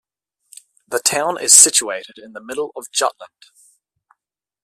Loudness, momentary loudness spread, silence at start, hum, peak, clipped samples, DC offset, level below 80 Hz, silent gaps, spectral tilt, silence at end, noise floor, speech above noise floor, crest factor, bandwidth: -14 LUFS; 22 LU; 0.9 s; none; 0 dBFS; under 0.1%; under 0.1%; -66 dBFS; none; 0.5 dB/octave; 1.4 s; -82 dBFS; 64 dB; 20 dB; 15.5 kHz